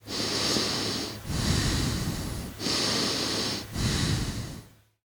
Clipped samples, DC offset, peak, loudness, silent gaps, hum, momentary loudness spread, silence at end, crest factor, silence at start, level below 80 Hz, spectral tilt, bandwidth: under 0.1%; under 0.1%; -12 dBFS; -28 LUFS; none; none; 9 LU; 0.4 s; 16 dB; 0.05 s; -40 dBFS; -3.5 dB/octave; over 20 kHz